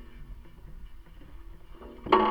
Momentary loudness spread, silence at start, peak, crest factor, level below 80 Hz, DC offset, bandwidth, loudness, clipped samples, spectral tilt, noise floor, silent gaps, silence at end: 27 LU; 0 s; -6 dBFS; 26 dB; -46 dBFS; under 0.1%; 6.2 kHz; -27 LUFS; under 0.1%; -7 dB/octave; -46 dBFS; none; 0 s